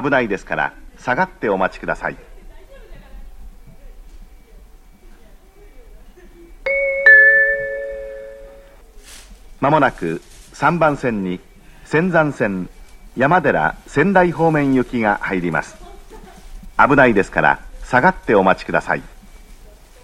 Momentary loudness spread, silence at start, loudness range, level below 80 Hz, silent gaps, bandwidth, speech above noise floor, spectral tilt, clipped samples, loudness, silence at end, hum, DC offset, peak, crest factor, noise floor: 15 LU; 0 s; 10 LU; -40 dBFS; none; 14.5 kHz; 27 dB; -6.5 dB/octave; under 0.1%; -16 LUFS; 0.5 s; none; under 0.1%; 0 dBFS; 18 dB; -43 dBFS